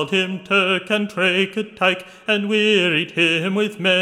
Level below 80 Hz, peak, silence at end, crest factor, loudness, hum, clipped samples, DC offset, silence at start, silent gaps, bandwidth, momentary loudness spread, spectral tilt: -68 dBFS; -2 dBFS; 0 s; 16 dB; -18 LUFS; none; under 0.1%; under 0.1%; 0 s; none; 15 kHz; 5 LU; -4.5 dB/octave